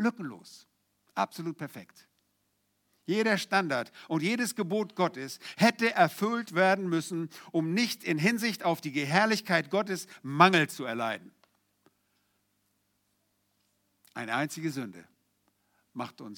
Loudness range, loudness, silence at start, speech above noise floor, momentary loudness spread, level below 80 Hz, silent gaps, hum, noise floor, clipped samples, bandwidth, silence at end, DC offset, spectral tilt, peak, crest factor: 12 LU; -29 LUFS; 0 s; 47 dB; 16 LU; -86 dBFS; none; 50 Hz at -60 dBFS; -76 dBFS; under 0.1%; 19.5 kHz; 0 s; under 0.1%; -4.5 dB/octave; -4 dBFS; 26 dB